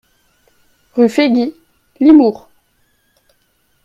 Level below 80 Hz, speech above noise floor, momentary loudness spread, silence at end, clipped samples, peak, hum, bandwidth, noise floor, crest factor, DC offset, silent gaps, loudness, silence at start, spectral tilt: -56 dBFS; 50 dB; 15 LU; 1.5 s; under 0.1%; 0 dBFS; none; 8 kHz; -60 dBFS; 16 dB; under 0.1%; none; -12 LUFS; 0.95 s; -6 dB/octave